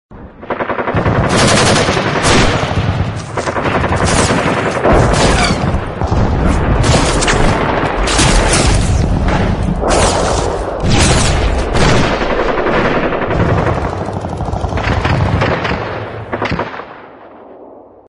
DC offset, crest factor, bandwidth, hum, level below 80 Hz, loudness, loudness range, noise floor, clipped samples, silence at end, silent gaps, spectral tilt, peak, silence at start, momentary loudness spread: under 0.1%; 12 dB; 11.5 kHz; none; -20 dBFS; -13 LUFS; 4 LU; -37 dBFS; under 0.1%; 0.25 s; none; -4.5 dB/octave; 0 dBFS; 0.1 s; 9 LU